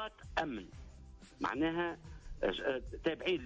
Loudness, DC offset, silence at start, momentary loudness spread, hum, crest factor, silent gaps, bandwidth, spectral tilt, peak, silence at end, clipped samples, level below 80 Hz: -38 LUFS; under 0.1%; 0 s; 20 LU; none; 16 dB; none; 8 kHz; -5.5 dB/octave; -22 dBFS; 0 s; under 0.1%; -54 dBFS